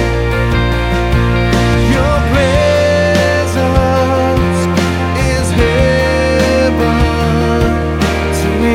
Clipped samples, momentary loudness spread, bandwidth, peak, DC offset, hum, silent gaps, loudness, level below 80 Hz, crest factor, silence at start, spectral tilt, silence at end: under 0.1%; 3 LU; 16 kHz; 0 dBFS; under 0.1%; none; none; -12 LUFS; -20 dBFS; 12 dB; 0 s; -6 dB/octave; 0 s